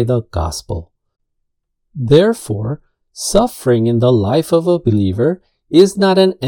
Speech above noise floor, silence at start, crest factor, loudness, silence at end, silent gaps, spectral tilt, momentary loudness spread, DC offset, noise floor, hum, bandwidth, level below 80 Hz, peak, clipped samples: 57 dB; 0 s; 14 dB; -14 LUFS; 0 s; none; -6 dB/octave; 14 LU; under 0.1%; -70 dBFS; none; 18 kHz; -38 dBFS; 0 dBFS; 0.2%